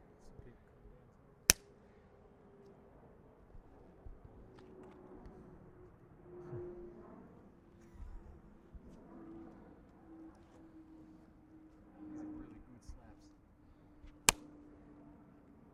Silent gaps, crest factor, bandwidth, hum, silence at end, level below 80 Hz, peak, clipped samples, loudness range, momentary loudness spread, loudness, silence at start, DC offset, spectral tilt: none; 42 dB; 11.5 kHz; none; 0 s; -60 dBFS; -4 dBFS; under 0.1%; 20 LU; 28 LU; -36 LUFS; 0 s; under 0.1%; -1 dB/octave